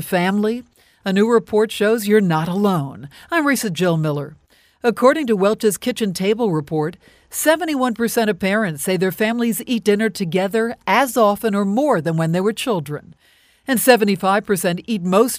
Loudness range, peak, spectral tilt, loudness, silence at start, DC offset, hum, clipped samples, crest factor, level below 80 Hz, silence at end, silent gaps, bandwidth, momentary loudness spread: 1 LU; 0 dBFS; -5 dB/octave; -18 LUFS; 0 s; under 0.1%; none; under 0.1%; 18 dB; -58 dBFS; 0 s; none; 16 kHz; 8 LU